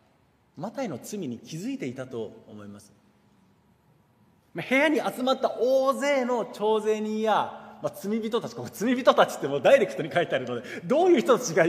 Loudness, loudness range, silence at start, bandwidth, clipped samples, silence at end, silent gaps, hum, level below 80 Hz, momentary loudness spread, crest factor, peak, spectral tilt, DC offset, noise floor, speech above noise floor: -25 LUFS; 13 LU; 0.55 s; 15.5 kHz; under 0.1%; 0 s; none; none; -74 dBFS; 16 LU; 20 dB; -6 dBFS; -4.5 dB/octave; under 0.1%; -64 dBFS; 39 dB